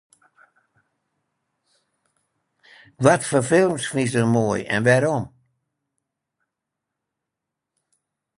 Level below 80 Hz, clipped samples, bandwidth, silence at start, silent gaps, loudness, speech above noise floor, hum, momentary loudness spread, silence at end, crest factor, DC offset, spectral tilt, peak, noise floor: -60 dBFS; under 0.1%; 11.5 kHz; 3 s; none; -20 LUFS; 64 dB; none; 6 LU; 3.1 s; 24 dB; under 0.1%; -5.5 dB/octave; -2 dBFS; -84 dBFS